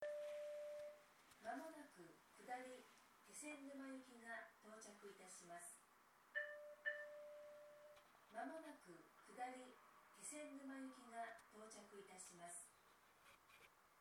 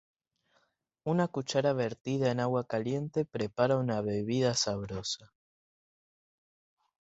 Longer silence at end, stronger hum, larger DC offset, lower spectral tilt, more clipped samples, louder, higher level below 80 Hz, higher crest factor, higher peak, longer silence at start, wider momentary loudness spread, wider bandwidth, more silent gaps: second, 0 s vs 1.85 s; neither; neither; second, -2.5 dB/octave vs -5 dB/octave; neither; second, -56 LUFS vs -31 LUFS; second, under -90 dBFS vs -64 dBFS; about the same, 22 dB vs 22 dB; second, -34 dBFS vs -12 dBFS; second, 0 s vs 1.05 s; first, 16 LU vs 7 LU; first, 19 kHz vs 8.2 kHz; second, none vs 2.01-2.05 s